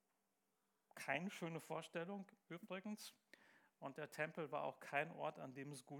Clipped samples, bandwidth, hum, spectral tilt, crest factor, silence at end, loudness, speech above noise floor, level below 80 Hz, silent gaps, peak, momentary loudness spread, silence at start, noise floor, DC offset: under 0.1%; 19.5 kHz; none; -5 dB/octave; 24 dB; 0 s; -49 LUFS; 38 dB; under -90 dBFS; none; -26 dBFS; 13 LU; 0.95 s; -87 dBFS; under 0.1%